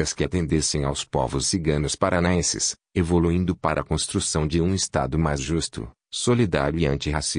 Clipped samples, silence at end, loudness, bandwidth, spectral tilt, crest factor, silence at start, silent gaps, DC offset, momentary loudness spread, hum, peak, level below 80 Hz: under 0.1%; 0 s; -23 LUFS; 10 kHz; -4.5 dB/octave; 18 dB; 0 s; none; under 0.1%; 5 LU; none; -6 dBFS; -38 dBFS